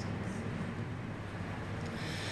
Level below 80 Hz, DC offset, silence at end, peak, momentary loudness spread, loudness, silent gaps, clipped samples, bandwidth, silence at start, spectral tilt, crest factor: -54 dBFS; under 0.1%; 0 s; -26 dBFS; 3 LU; -40 LUFS; none; under 0.1%; 12 kHz; 0 s; -6 dB/octave; 12 dB